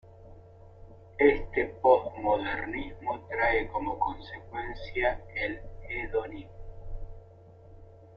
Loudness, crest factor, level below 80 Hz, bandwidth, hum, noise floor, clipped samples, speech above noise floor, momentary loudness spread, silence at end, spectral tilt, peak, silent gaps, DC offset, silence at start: -29 LUFS; 22 dB; -46 dBFS; 5.8 kHz; none; -52 dBFS; under 0.1%; 21 dB; 22 LU; 0 s; -8 dB/octave; -8 dBFS; none; under 0.1%; 0.05 s